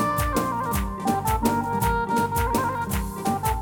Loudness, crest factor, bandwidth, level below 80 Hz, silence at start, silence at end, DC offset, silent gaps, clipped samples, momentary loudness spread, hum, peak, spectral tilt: -24 LUFS; 16 dB; over 20 kHz; -34 dBFS; 0 s; 0 s; under 0.1%; none; under 0.1%; 4 LU; none; -8 dBFS; -5.5 dB/octave